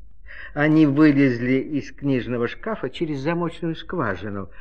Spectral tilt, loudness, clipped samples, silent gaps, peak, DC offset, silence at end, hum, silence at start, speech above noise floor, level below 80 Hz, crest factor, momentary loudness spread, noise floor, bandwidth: -8 dB/octave; -22 LUFS; under 0.1%; none; -4 dBFS; 1%; 0 s; none; 0 s; 20 dB; -48 dBFS; 18 dB; 14 LU; -41 dBFS; 6.6 kHz